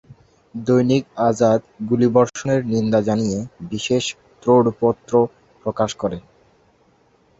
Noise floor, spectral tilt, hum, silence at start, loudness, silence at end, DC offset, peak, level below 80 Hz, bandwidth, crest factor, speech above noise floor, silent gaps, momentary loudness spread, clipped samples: -58 dBFS; -6 dB/octave; none; 0.55 s; -19 LUFS; 1.2 s; under 0.1%; -2 dBFS; -54 dBFS; 8 kHz; 18 dB; 39 dB; none; 12 LU; under 0.1%